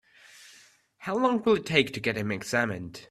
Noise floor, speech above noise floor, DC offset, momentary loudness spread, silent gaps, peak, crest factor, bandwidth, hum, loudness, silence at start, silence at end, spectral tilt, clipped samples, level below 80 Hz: -58 dBFS; 31 dB; under 0.1%; 9 LU; none; -6 dBFS; 22 dB; 14 kHz; none; -27 LUFS; 0.4 s; 0.05 s; -5 dB/octave; under 0.1%; -64 dBFS